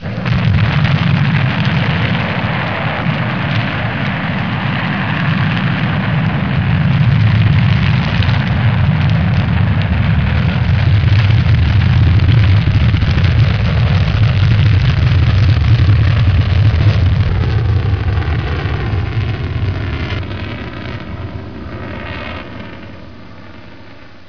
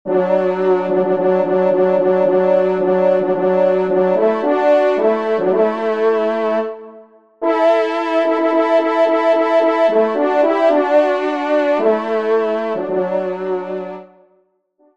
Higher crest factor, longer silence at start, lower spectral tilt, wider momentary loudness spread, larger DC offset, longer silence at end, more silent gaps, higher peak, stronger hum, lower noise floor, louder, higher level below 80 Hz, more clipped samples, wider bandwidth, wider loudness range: about the same, 12 dB vs 14 dB; about the same, 0 s vs 0.05 s; about the same, -8 dB/octave vs -7.5 dB/octave; first, 13 LU vs 6 LU; first, 2% vs 0.3%; second, 0.2 s vs 0.9 s; neither; about the same, 0 dBFS vs -2 dBFS; neither; second, -38 dBFS vs -59 dBFS; about the same, -14 LUFS vs -16 LUFS; first, -24 dBFS vs -68 dBFS; neither; second, 5.4 kHz vs 7.4 kHz; first, 10 LU vs 3 LU